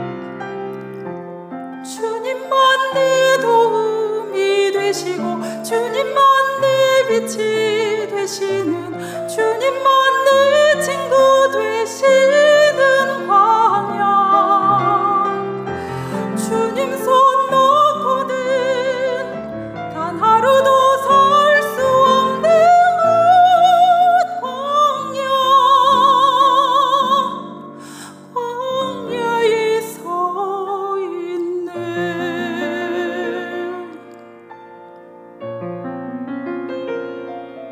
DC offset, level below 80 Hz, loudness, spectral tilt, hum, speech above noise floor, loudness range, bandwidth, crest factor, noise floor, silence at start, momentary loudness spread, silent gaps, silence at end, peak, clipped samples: under 0.1%; -66 dBFS; -15 LUFS; -3.5 dB/octave; none; 22 dB; 11 LU; 16 kHz; 12 dB; -39 dBFS; 0 s; 16 LU; none; 0 s; -4 dBFS; under 0.1%